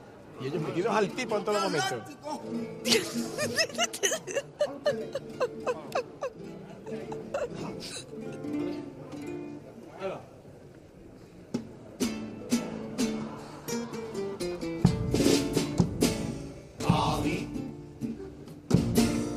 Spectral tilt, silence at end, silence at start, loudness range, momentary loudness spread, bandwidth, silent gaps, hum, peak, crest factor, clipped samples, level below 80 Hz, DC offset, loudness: -4.5 dB/octave; 0 s; 0 s; 10 LU; 17 LU; 15.5 kHz; none; none; -8 dBFS; 24 dB; under 0.1%; -50 dBFS; under 0.1%; -31 LUFS